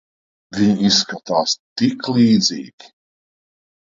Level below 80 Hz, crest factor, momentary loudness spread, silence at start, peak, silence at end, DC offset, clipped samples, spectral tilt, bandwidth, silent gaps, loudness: -58 dBFS; 16 dB; 13 LU; 0.5 s; -2 dBFS; 1.25 s; under 0.1%; under 0.1%; -4 dB/octave; 7.6 kHz; 1.59-1.76 s; -17 LUFS